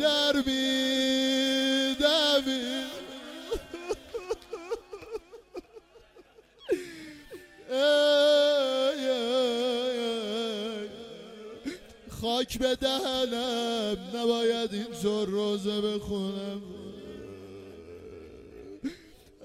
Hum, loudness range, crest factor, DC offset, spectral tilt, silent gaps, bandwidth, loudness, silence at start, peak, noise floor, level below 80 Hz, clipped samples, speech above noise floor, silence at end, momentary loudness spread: none; 13 LU; 18 dB; under 0.1%; -3.5 dB/octave; none; 16 kHz; -28 LUFS; 0 s; -12 dBFS; -56 dBFS; -56 dBFS; under 0.1%; 28 dB; 0 s; 22 LU